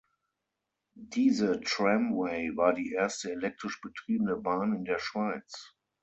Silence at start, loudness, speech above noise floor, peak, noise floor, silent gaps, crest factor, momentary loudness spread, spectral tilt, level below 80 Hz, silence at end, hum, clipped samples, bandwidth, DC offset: 0.95 s; -30 LUFS; 55 dB; -12 dBFS; -86 dBFS; none; 20 dB; 12 LU; -5 dB/octave; -68 dBFS; 0.35 s; none; under 0.1%; 8.2 kHz; under 0.1%